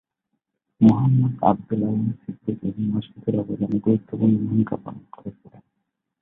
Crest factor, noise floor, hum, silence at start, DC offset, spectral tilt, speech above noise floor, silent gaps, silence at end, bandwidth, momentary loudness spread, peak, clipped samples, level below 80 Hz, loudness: 20 dB; -78 dBFS; none; 0.8 s; under 0.1%; -11.5 dB/octave; 57 dB; none; 0.9 s; 3.8 kHz; 16 LU; -2 dBFS; under 0.1%; -56 dBFS; -22 LUFS